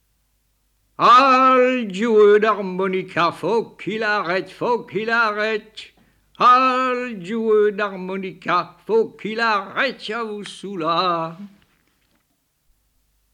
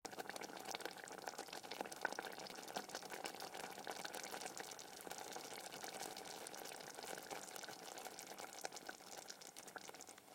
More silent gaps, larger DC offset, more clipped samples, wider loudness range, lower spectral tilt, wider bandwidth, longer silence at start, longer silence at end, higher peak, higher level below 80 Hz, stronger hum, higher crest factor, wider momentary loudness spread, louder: neither; neither; neither; first, 8 LU vs 3 LU; first, -5 dB/octave vs -1 dB/octave; second, 10.5 kHz vs 17 kHz; first, 1 s vs 0.05 s; first, 1.85 s vs 0 s; first, -4 dBFS vs -24 dBFS; first, -66 dBFS vs -88 dBFS; neither; second, 16 dB vs 26 dB; first, 14 LU vs 5 LU; first, -18 LUFS vs -50 LUFS